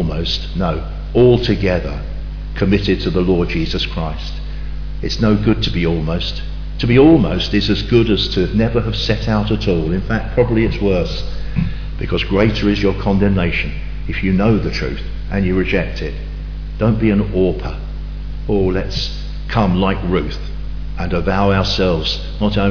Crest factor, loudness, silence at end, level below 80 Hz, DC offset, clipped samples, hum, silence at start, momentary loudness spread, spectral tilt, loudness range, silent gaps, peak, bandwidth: 16 dB; -17 LUFS; 0 s; -24 dBFS; under 0.1%; under 0.1%; 50 Hz at -25 dBFS; 0 s; 13 LU; -7 dB/octave; 4 LU; none; 0 dBFS; 5.4 kHz